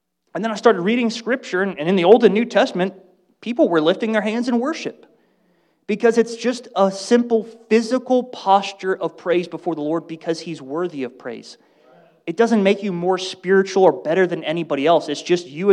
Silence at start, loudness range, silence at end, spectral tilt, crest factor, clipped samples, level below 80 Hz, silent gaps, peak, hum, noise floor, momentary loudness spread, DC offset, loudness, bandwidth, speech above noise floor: 0.35 s; 5 LU; 0 s; -5.5 dB/octave; 18 dB; under 0.1%; -74 dBFS; none; 0 dBFS; none; -62 dBFS; 11 LU; under 0.1%; -19 LUFS; 10.5 kHz; 43 dB